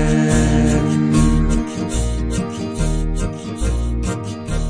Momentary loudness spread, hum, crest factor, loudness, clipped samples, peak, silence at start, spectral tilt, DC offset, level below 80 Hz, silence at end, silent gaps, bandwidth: 9 LU; none; 16 dB; -19 LUFS; under 0.1%; -2 dBFS; 0 s; -6 dB/octave; under 0.1%; -22 dBFS; 0 s; none; 10.5 kHz